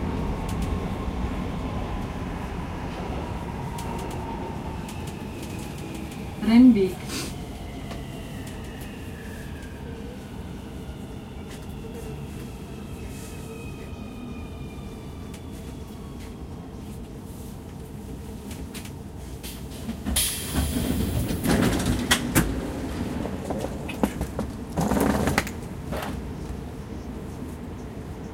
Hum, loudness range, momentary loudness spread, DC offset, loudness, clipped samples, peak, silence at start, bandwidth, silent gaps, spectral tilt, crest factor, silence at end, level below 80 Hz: none; 14 LU; 15 LU; under 0.1%; -29 LUFS; under 0.1%; -4 dBFS; 0 s; 16.5 kHz; none; -5 dB/octave; 24 dB; 0 s; -38 dBFS